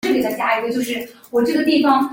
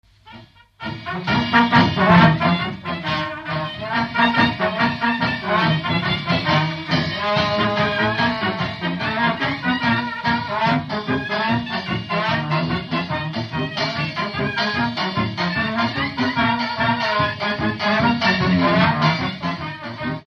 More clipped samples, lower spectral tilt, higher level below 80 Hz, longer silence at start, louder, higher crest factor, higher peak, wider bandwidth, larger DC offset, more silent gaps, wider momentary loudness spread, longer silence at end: neither; second, -4 dB/octave vs -6.5 dB/octave; second, -58 dBFS vs -46 dBFS; second, 0.05 s vs 0.25 s; about the same, -18 LUFS vs -20 LUFS; about the same, 14 dB vs 18 dB; about the same, -4 dBFS vs -2 dBFS; first, 17 kHz vs 6.8 kHz; neither; neither; about the same, 8 LU vs 9 LU; about the same, 0 s vs 0.05 s